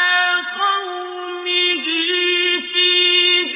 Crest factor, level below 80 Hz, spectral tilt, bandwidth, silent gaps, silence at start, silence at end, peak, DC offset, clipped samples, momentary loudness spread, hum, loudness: 14 dB; -72 dBFS; -3 dB/octave; 3.9 kHz; none; 0 s; 0 s; -4 dBFS; under 0.1%; under 0.1%; 14 LU; none; -15 LUFS